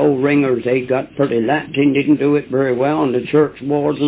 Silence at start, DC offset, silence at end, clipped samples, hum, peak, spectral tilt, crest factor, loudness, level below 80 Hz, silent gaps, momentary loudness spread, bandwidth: 0 s; under 0.1%; 0 s; under 0.1%; none; -4 dBFS; -11 dB/octave; 12 dB; -16 LUFS; -54 dBFS; none; 4 LU; 4 kHz